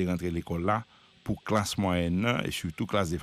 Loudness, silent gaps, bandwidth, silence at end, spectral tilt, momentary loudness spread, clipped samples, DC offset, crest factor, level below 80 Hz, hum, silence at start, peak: -30 LUFS; none; 15.5 kHz; 0 s; -5.5 dB/octave; 7 LU; under 0.1%; under 0.1%; 18 dB; -50 dBFS; none; 0 s; -12 dBFS